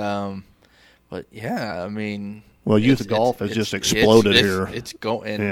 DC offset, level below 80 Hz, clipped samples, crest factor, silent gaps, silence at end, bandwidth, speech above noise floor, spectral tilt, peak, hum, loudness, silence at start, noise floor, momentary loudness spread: under 0.1%; -48 dBFS; under 0.1%; 20 dB; none; 0 s; 16.5 kHz; 34 dB; -4.5 dB/octave; -2 dBFS; none; -20 LUFS; 0 s; -55 dBFS; 19 LU